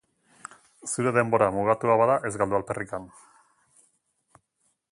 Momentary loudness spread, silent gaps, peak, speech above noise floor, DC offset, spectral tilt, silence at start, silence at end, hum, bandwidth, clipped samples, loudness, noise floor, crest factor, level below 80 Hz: 24 LU; none; -6 dBFS; 49 dB; under 0.1%; -6 dB/octave; 0.85 s; 1.85 s; none; 11.5 kHz; under 0.1%; -24 LUFS; -73 dBFS; 22 dB; -60 dBFS